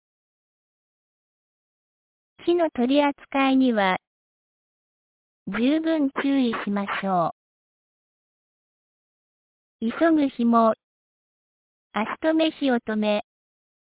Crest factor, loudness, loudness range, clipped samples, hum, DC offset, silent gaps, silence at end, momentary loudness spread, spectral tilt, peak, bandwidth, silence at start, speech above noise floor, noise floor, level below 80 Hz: 18 dB; -23 LUFS; 5 LU; under 0.1%; none; under 0.1%; 4.07-5.46 s, 7.32-9.79 s, 10.83-11.90 s; 0.75 s; 10 LU; -9.5 dB/octave; -8 dBFS; 4 kHz; 2.4 s; over 68 dB; under -90 dBFS; -66 dBFS